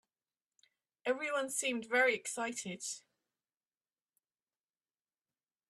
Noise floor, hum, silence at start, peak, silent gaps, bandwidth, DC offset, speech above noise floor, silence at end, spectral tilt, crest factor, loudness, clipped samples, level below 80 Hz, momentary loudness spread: under -90 dBFS; none; 1.05 s; -18 dBFS; none; 13.5 kHz; under 0.1%; over 54 dB; 2.7 s; -2 dB/octave; 22 dB; -35 LUFS; under 0.1%; -88 dBFS; 12 LU